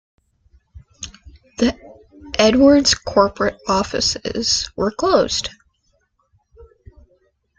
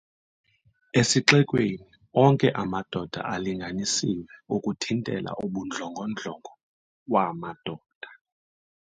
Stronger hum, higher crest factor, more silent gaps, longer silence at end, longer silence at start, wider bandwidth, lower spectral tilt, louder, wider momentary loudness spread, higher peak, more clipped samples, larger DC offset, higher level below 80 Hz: neither; second, 20 dB vs 26 dB; second, none vs 6.63-7.06 s, 7.95-8.01 s; about the same, 0.95 s vs 0.85 s; second, 0.75 s vs 0.95 s; about the same, 9.4 kHz vs 9.6 kHz; about the same, -3.5 dB/octave vs -4.5 dB/octave; first, -17 LUFS vs -26 LUFS; first, 23 LU vs 18 LU; about the same, 0 dBFS vs 0 dBFS; neither; neither; first, -44 dBFS vs -60 dBFS